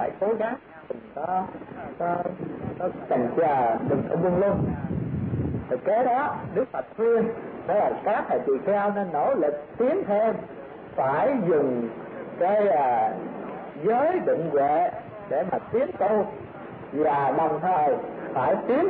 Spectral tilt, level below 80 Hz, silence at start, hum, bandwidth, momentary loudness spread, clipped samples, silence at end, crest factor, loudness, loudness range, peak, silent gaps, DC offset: -11.5 dB/octave; -54 dBFS; 0 s; none; 4.4 kHz; 12 LU; under 0.1%; 0 s; 12 dB; -25 LUFS; 2 LU; -12 dBFS; none; under 0.1%